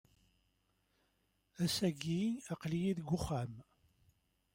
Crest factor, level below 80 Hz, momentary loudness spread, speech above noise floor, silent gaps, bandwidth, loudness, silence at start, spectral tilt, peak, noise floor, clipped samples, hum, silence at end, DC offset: 18 dB; -62 dBFS; 7 LU; 42 dB; none; 16 kHz; -38 LUFS; 1.6 s; -5.5 dB/octave; -22 dBFS; -79 dBFS; under 0.1%; none; 0.95 s; under 0.1%